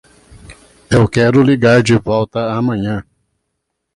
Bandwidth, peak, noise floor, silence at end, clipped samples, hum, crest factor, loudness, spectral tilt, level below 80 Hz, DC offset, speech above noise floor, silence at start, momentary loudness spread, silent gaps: 11.5 kHz; 0 dBFS; -73 dBFS; 0.95 s; under 0.1%; none; 14 dB; -13 LUFS; -6.5 dB/octave; -40 dBFS; under 0.1%; 60 dB; 0.35 s; 9 LU; none